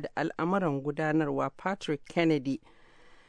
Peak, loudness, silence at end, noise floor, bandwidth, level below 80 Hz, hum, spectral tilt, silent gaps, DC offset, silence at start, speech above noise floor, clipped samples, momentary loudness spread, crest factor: -14 dBFS; -30 LUFS; 0.2 s; -55 dBFS; 10 kHz; -64 dBFS; none; -7 dB/octave; none; under 0.1%; 0 s; 25 dB; under 0.1%; 7 LU; 18 dB